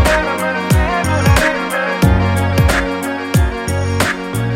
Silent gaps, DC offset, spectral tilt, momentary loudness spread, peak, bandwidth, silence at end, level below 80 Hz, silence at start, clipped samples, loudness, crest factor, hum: none; under 0.1%; -5.5 dB/octave; 5 LU; 0 dBFS; 16.5 kHz; 0 s; -22 dBFS; 0 s; under 0.1%; -15 LUFS; 14 dB; none